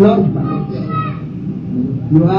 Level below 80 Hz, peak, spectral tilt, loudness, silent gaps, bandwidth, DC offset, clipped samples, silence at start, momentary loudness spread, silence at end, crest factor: -42 dBFS; 0 dBFS; -11 dB/octave; -17 LUFS; none; 5.6 kHz; under 0.1%; under 0.1%; 0 s; 11 LU; 0 s; 14 dB